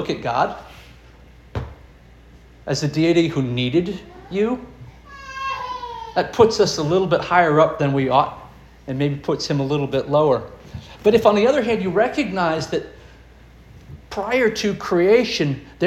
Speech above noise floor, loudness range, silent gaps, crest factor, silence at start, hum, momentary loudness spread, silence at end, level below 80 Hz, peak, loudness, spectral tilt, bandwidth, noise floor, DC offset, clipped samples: 27 dB; 5 LU; none; 20 dB; 0 s; none; 18 LU; 0 s; -46 dBFS; -2 dBFS; -19 LUFS; -5.5 dB/octave; 13.5 kHz; -46 dBFS; under 0.1%; under 0.1%